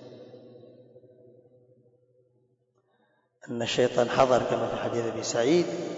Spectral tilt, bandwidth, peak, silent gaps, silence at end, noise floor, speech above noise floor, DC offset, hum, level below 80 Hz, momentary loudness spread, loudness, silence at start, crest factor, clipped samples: -4.5 dB/octave; 8 kHz; -10 dBFS; none; 0 s; -70 dBFS; 45 dB; under 0.1%; none; -64 dBFS; 19 LU; -26 LUFS; 0 s; 20 dB; under 0.1%